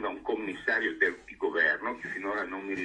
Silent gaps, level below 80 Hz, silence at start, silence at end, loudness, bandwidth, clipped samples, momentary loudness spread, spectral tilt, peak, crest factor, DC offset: none; -64 dBFS; 0 s; 0 s; -30 LUFS; 10 kHz; under 0.1%; 8 LU; -4.5 dB/octave; -12 dBFS; 18 dB; under 0.1%